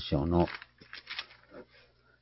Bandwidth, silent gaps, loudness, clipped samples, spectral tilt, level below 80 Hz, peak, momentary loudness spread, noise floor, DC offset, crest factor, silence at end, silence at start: 5.8 kHz; none; -33 LUFS; under 0.1%; -10 dB/octave; -46 dBFS; -12 dBFS; 24 LU; -63 dBFS; under 0.1%; 22 dB; 0.6 s; 0 s